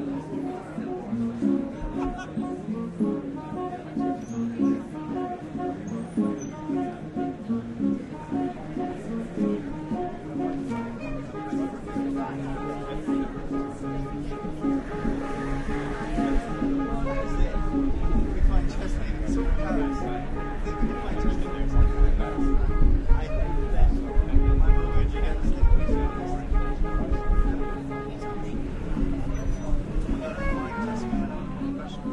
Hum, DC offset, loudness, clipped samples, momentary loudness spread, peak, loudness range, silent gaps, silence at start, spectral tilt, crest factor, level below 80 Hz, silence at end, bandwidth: none; under 0.1%; -29 LUFS; under 0.1%; 7 LU; -6 dBFS; 5 LU; none; 0 s; -8 dB/octave; 18 dB; -26 dBFS; 0 s; 8.4 kHz